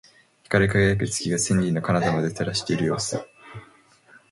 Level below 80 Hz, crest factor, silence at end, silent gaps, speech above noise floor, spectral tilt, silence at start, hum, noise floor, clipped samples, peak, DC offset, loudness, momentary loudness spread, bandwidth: -46 dBFS; 20 dB; 0.65 s; none; 32 dB; -5 dB/octave; 0.5 s; none; -55 dBFS; under 0.1%; -4 dBFS; under 0.1%; -23 LUFS; 19 LU; 11.5 kHz